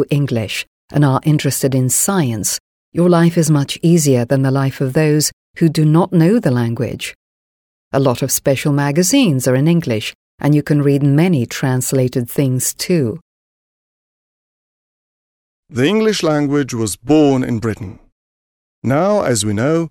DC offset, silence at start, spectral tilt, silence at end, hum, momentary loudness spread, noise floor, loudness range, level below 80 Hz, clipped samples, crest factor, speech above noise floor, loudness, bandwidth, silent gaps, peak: under 0.1%; 0 s; -5.5 dB/octave; 0 s; none; 9 LU; under -90 dBFS; 6 LU; -50 dBFS; under 0.1%; 14 dB; over 76 dB; -15 LUFS; 19 kHz; 0.67-0.88 s, 2.60-2.92 s, 5.33-5.54 s, 7.15-7.91 s, 10.15-10.38 s, 13.21-15.63 s, 18.12-18.82 s; -2 dBFS